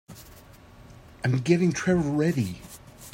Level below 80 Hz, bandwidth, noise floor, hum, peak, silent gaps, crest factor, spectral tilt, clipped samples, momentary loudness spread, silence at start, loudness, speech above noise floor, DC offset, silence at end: -54 dBFS; 16.5 kHz; -50 dBFS; none; -8 dBFS; none; 20 dB; -6.5 dB/octave; under 0.1%; 23 LU; 0.1 s; -25 LUFS; 26 dB; under 0.1%; 0.05 s